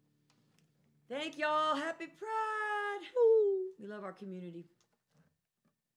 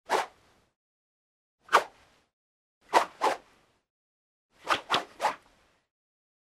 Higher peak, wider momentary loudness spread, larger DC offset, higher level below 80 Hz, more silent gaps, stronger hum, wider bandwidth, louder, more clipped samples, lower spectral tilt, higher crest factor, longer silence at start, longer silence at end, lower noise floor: second, -20 dBFS vs -6 dBFS; about the same, 18 LU vs 16 LU; neither; second, under -90 dBFS vs -74 dBFS; second, none vs 0.76-1.58 s, 2.33-2.81 s, 3.90-4.49 s; neither; second, 10.5 kHz vs 16 kHz; second, -33 LUFS vs -29 LUFS; neither; first, -4.5 dB/octave vs -1.5 dB/octave; second, 16 dB vs 28 dB; first, 1.1 s vs 0.1 s; first, 1.35 s vs 1.15 s; first, -81 dBFS vs -65 dBFS